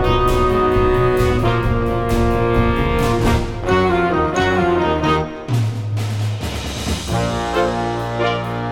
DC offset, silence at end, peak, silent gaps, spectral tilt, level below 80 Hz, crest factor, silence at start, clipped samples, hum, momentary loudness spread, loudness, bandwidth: under 0.1%; 0 s; -2 dBFS; none; -6.5 dB/octave; -26 dBFS; 14 dB; 0 s; under 0.1%; none; 6 LU; -18 LUFS; 17.5 kHz